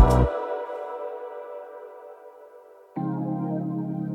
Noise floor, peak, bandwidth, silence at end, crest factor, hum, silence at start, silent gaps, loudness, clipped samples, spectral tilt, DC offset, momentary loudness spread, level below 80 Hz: -49 dBFS; -2 dBFS; 13.5 kHz; 0 s; 24 dB; none; 0 s; none; -29 LUFS; under 0.1%; -8.5 dB/octave; under 0.1%; 21 LU; -32 dBFS